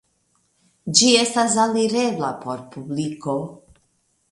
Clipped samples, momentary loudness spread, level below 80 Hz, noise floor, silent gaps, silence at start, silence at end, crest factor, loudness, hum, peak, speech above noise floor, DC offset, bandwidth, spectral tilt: under 0.1%; 17 LU; -64 dBFS; -67 dBFS; none; 0.85 s; 0.75 s; 22 dB; -19 LUFS; none; 0 dBFS; 46 dB; under 0.1%; 11.5 kHz; -3 dB/octave